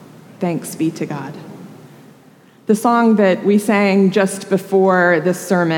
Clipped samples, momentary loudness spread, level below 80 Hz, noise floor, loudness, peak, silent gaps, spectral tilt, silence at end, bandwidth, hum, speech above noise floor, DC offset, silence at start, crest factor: under 0.1%; 14 LU; -74 dBFS; -47 dBFS; -16 LUFS; -2 dBFS; none; -6 dB/octave; 0 s; 17.5 kHz; none; 32 dB; under 0.1%; 0.4 s; 14 dB